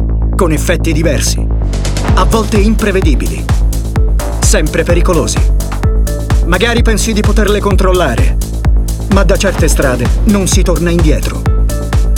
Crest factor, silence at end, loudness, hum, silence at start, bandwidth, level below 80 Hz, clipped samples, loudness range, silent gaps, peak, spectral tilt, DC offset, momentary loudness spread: 10 dB; 0 s; -12 LUFS; none; 0 s; 16 kHz; -12 dBFS; under 0.1%; 1 LU; none; 0 dBFS; -5 dB/octave; under 0.1%; 4 LU